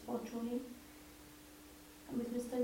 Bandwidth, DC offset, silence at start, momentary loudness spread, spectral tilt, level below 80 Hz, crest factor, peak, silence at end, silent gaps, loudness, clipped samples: 16.5 kHz; under 0.1%; 0 s; 16 LU; -5.5 dB/octave; -68 dBFS; 18 dB; -26 dBFS; 0 s; none; -43 LUFS; under 0.1%